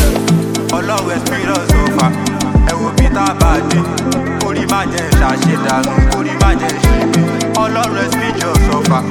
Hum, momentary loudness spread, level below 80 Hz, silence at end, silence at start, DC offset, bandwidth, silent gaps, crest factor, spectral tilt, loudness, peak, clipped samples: none; 4 LU; -18 dBFS; 0 s; 0 s; under 0.1%; 17.5 kHz; none; 12 dB; -5 dB/octave; -13 LUFS; 0 dBFS; under 0.1%